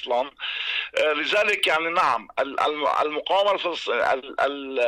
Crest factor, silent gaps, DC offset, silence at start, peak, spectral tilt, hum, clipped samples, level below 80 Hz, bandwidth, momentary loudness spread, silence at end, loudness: 12 dB; none; under 0.1%; 0 s; -12 dBFS; -2 dB/octave; none; under 0.1%; -64 dBFS; 15.5 kHz; 5 LU; 0 s; -23 LUFS